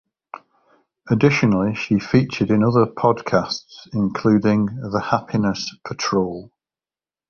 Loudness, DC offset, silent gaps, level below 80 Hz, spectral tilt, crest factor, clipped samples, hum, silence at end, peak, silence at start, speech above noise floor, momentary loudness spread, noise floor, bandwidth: -20 LUFS; under 0.1%; none; -50 dBFS; -6.5 dB/octave; 18 dB; under 0.1%; none; 0.85 s; -2 dBFS; 1.05 s; over 71 dB; 12 LU; under -90 dBFS; 7 kHz